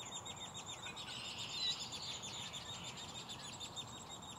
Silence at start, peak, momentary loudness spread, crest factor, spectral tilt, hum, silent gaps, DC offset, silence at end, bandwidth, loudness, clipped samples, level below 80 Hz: 0 s; -28 dBFS; 9 LU; 18 dB; -1.5 dB/octave; none; none; under 0.1%; 0 s; 16 kHz; -44 LUFS; under 0.1%; -70 dBFS